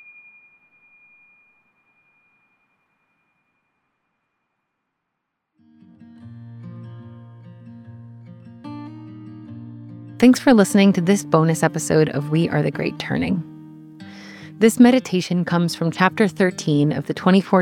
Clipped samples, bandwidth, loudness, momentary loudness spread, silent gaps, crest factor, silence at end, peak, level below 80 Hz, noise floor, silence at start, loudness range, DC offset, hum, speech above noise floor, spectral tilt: under 0.1%; 17 kHz; -18 LUFS; 25 LU; none; 20 dB; 0 s; -2 dBFS; -62 dBFS; -78 dBFS; 6.25 s; 22 LU; under 0.1%; none; 61 dB; -6 dB/octave